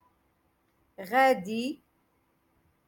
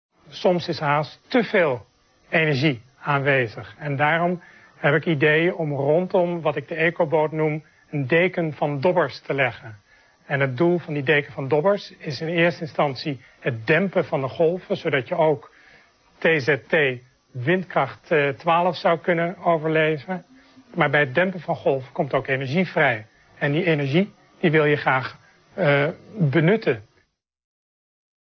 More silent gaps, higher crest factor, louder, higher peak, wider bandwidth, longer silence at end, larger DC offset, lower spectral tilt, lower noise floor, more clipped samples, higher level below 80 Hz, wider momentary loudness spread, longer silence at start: neither; about the same, 20 dB vs 18 dB; second, -27 LUFS vs -22 LUFS; second, -12 dBFS vs -4 dBFS; first, 17.5 kHz vs 6.4 kHz; second, 1.15 s vs 1.4 s; neither; second, -4.5 dB/octave vs -7.5 dB/octave; first, -71 dBFS vs -66 dBFS; neither; second, -76 dBFS vs -62 dBFS; first, 22 LU vs 10 LU; first, 1 s vs 0.3 s